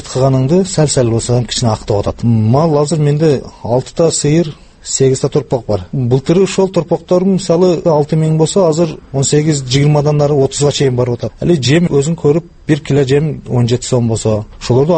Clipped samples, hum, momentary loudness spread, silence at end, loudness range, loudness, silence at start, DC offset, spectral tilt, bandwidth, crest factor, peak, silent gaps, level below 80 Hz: under 0.1%; none; 6 LU; 0 s; 2 LU; -13 LUFS; 0 s; under 0.1%; -6 dB/octave; 8.8 kHz; 12 dB; 0 dBFS; none; -38 dBFS